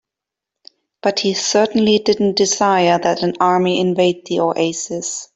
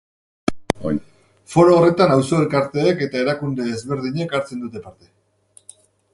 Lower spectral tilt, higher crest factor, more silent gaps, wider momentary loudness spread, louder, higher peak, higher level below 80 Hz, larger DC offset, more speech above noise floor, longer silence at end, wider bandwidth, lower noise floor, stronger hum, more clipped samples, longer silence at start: second, -4 dB/octave vs -6.5 dB/octave; second, 14 dB vs 20 dB; neither; second, 6 LU vs 13 LU; first, -16 LUFS vs -19 LUFS; about the same, -2 dBFS vs 0 dBFS; second, -58 dBFS vs -52 dBFS; neither; first, 69 dB vs 36 dB; second, 0.1 s vs 1.25 s; second, 8.4 kHz vs 11.5 kHz; first, -85 dBFS vs -54 dBFS; neither; neither; first, 1.05 s vs 0.5 s